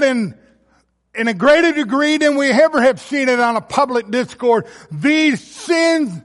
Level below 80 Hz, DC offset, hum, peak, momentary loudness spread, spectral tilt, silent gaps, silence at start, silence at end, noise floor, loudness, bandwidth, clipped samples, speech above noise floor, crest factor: -58 dBFS; under 0.1%; none; -2 dBFS; 9 LU; -4.5 dB/octave; none; 0 s; 0.05 s; -59 dBFS; -15 LUFS; 11.5 kHz; under 0.1%; 44 dB; 14 dB